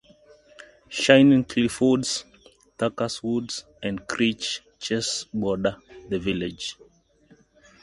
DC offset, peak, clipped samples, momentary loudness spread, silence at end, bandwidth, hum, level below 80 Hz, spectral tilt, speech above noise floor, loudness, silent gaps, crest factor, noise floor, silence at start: under 0.1%; 0 dBFS; under 0.1%; 14 LU; 1.1 s; 11.5 kHz; none; -54 dBFS; -4.5 dB/octave; 35 dB; -24 LUFS; none; 24 dB; -58 dBFS; 0.9 s